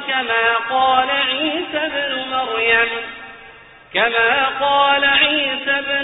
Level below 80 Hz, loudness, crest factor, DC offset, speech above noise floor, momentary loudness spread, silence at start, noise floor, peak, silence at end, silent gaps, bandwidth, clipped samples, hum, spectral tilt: -54 dBFS; -16 LUFS; 16 dB; under 0.1%; 25 dB; 8 LU; 0 s; -42 dBFS; -2 dBFS; 0 s; none; 4.1 kHz; under 0.1%; none; 2 dB/octave